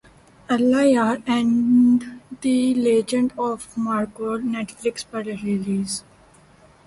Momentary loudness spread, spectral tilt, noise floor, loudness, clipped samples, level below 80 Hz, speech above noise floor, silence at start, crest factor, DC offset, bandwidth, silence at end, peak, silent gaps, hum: 11 LU; -5.5 dB/octave; -52 dBFS; -21 LUFS; under 0.1%; -58 dBFS; 31 dB; 0.5 s; 14 dB; under 0.1%; 11.5 kHz; 0.85 s; -6 dBFS; none; none